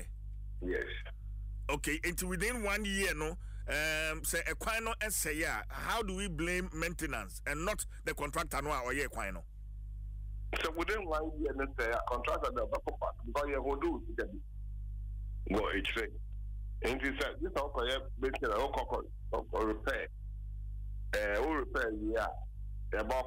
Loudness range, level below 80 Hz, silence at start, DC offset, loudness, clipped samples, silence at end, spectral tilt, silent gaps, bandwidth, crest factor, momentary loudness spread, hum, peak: 3 LU; -44 dBFS; 0 s; under 0.1%; -37 LUFS; under 0.1%; 0 s; -4 dB/octave; none; 16 kHz; 14 dB; 12 LU; 50 Hz at -45 dBFS; -22 dBFS